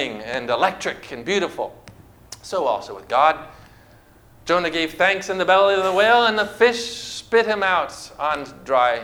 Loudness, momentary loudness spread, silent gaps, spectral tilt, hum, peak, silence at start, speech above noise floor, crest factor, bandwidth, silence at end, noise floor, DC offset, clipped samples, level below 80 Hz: -20 LUFS; 14 LU; none; -3 dB/octave; none; -2 dBFS; 0 s; 30 dB; 20 dB; 19 kHz; 0 s; -50 dBFS; under 0.1%; under 0.1%; -54 dBFS